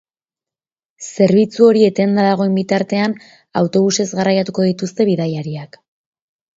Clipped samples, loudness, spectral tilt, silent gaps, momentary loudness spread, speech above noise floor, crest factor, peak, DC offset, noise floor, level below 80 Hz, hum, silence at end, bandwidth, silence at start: under 0.1%; -15 LUFS; -6 dB/octave; none; 13 LU; over 75 dB; 16 dB; 0 dBFS; under 0.1%; under -90 dBFS; -62 dBFS; none; 0.9 s; 7.8 kHz; 1 s